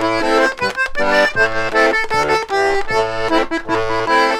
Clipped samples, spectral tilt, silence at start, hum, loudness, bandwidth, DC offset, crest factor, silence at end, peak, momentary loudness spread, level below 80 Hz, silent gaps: under 0.1%; -3.5 dB/octave; 0 s; none; -16 LUFS; 15.5 kHz; under 0.1%; 14 dB; 0 s; -2 dBFS; 4 LU; -36 dBFS; none